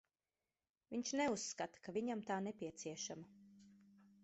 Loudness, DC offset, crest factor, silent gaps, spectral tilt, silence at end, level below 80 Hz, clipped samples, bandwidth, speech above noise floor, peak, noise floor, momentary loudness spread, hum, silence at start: -44 LUFS; under 0.1%; 18 dB; none; -4 dB/octave; 0.15 s; -82 dBFS; under 0.1%; 8 kHz; over 46 dB; -28 dBFS; under -90 dBFS; 9 LU; none; 0.9 s